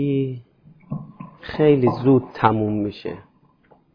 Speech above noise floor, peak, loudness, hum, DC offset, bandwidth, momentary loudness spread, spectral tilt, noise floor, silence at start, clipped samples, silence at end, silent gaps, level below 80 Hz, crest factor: 37 dB; -4 dBFS; -19 LUFS; none; under 0.1%; 5.4 kHz; 21 LU; -10 dB/octave; -56 dBFS; 0 s; under 0.1%; 0.75 s; none; -52 dBFS; 18 dB